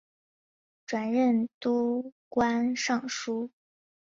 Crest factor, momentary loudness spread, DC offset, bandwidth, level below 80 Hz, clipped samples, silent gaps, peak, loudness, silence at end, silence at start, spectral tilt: 18 dB; 10 LU; under 0.1%; 7.6 kHz; -68 dBFS; under 0.1%; 1.54-1.61 s, 2.12-2.31 s; -12 dBFS; -29 LUFS; 0.55 s; 0.9 s; -4 dB/octave